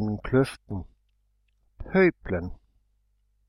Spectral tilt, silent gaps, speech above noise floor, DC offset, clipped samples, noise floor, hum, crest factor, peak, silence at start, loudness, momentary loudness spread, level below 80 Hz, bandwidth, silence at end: -8 dB/octave; none; 44 dB; under 0.1%; under 0.1%; -69 dBFS; 50 Hz at -55 dBFS; 18 dB; -10 dBFS; 0 s; -25 LUFS; 16 LU; -46 dBFS; 12 kHz; 0.95 s